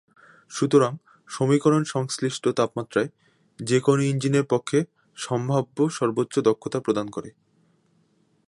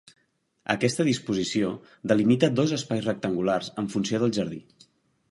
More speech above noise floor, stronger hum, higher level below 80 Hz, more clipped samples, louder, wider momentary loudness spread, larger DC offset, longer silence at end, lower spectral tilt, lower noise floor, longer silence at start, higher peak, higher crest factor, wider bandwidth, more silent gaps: second, 42 dB vs 46 dB; neither; second, -68 dBFS vs -62 dBFS; neither; about the same, -24 LUFS vs -26 LUFS; first, 14 LU vs 9 LU; neither; first, 1.15 s vs 0.7 s; about the same, -6 dB/octave vs -5.5 dB/octave; second, -65 dBFS vs -71 dBFS; second, 0.5 s vs 0.7 s; about the same, -6 dBFS vs -4 dBFS; about the same, 18 dB vs 22 dB; about the same, 11.5 kHz vs 11.5 kHz; neither